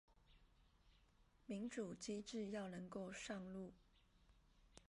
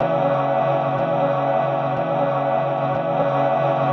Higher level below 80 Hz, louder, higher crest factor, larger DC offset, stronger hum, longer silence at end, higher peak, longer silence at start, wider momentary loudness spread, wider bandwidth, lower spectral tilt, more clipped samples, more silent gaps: second, -74 dBFS vs -62 dBFS; second, -51 LUFS vs -20 LUFS; first, 18 dB vs 12 dB; neither; neither; about the same, 0.05 s vs 0 s; second, -36 dBFS vs -8 dBFS; about the same, 0.1 s vs 0 s; first, 9 LU vs 2 LU; first, 11.5 kHz vs 6.2 kHz; second, -5 dB/octave vs -8.5 dB/octave; neither; neither